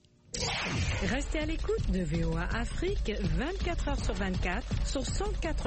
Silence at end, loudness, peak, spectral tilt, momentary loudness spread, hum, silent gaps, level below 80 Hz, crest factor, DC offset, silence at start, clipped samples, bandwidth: 0 s; -33 LUFS; -18 dBFS; -5 dB/octave; 3 LU; none; none; -34 dBFS; 12 dB; under 0.1%; 0.35 s; under 0.1%; 8.8 kHz